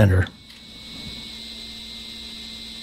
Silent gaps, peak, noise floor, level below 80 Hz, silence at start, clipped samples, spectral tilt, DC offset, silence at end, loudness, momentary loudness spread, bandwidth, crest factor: none; -4 dBFS; -42 dBFS; -44 dBFS; 0 s; under 0.1%; -6 dB/octave; under 0.1%; 0 s; -29 LUFS; 14 LU; 13.5 kHz; 22 dB